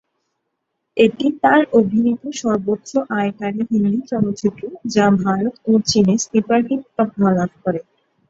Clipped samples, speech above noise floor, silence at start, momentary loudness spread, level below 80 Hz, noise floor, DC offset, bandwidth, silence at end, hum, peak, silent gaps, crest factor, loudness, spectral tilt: under 0.1%; 58 dB; 0.95 s; 8 LU; -54 dBFS; -75 dBFS; under 0.1%; 8 kHz; 0.5 s; none; -2 dBFS; none; 16 dB; -18 LUFS; -5.5 dB/octave